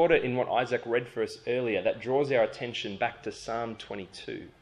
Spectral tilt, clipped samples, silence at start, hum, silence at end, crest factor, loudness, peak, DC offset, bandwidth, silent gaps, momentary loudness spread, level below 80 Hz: -5.5 dB/octave; under 0.1%; 0 s; none; 0.1 s; 20 dB; -30 LUFS; -10 dBFS; under 0.1%; 11.5 kHz; none; 14 LU; -62 dBFS